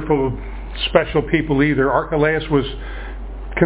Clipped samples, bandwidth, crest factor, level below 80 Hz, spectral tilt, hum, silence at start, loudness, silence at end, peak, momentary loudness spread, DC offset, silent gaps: under 0.1%; 4 kHz; 18 dB; -30 dBFS; -10.5 dB/octave; none; 0 s; -18 LUFS; 0 s; 0 dBFS; 15 LU; under 0.1%; none